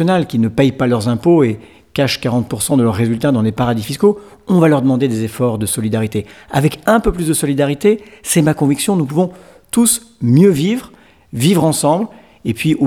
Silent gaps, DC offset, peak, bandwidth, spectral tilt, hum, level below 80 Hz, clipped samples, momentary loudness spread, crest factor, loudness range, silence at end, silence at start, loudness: none; 0.1%; 0 dBFS; 19 kHz; -5.5 dB/octave; none; -40 dBFS; under 0.1%; 8 LU; 14 dB; 1 LU; 0 s; 0 s; -15 LUFS